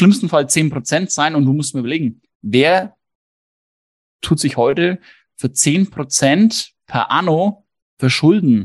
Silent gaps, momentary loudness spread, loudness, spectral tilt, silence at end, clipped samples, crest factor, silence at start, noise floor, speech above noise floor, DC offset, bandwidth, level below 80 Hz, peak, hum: 2.35-2.40 s, 3.15-4.19 s, 7.82-7.97 s; 10 LU; -16 LUFS; -4.5 dB/octave; 0 s; under 0.1%; 16 dB; 0 s; under -90 dBFS; over 75 dB; under 0.1%; 12.5 kHz; -54 dBFS; 0 dBFS; none